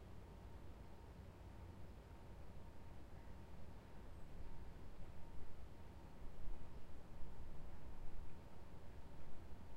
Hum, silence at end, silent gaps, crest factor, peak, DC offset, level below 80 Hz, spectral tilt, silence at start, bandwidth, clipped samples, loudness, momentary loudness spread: none; 0 s; none; 14 dB; -32 dBFS; under 0.1%; -56 dBFS; -7 dB/octave; 0 s; 8.8 kHz; under 0.1%; -60 LUFS; 2 LU